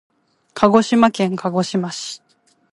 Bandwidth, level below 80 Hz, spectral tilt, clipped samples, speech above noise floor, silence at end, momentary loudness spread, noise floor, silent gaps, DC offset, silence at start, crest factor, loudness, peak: 11.5 kHz; -58 dBFS; -5.5 dB/octave; under 0.1%; 22 dB; 0.55 s; 18 LU; -39 dBFS; none; under 0.1%; 0.55 s; 18 dB; -17 LUFS; 0 dBFS